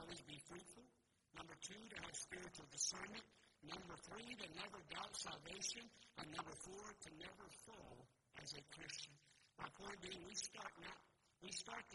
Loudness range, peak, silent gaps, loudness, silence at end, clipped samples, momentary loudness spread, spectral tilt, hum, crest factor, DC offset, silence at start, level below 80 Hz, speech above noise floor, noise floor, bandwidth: 6 LU; -28 dBFS; none; -52 LUFS; 0 s; under 0.1%; 14 LU; -1.5 dB/octave; none; 26 dB; under 0.1%; 0 s; -78 dBFS; 22 dB; -77 dBFS; 11.5 kHz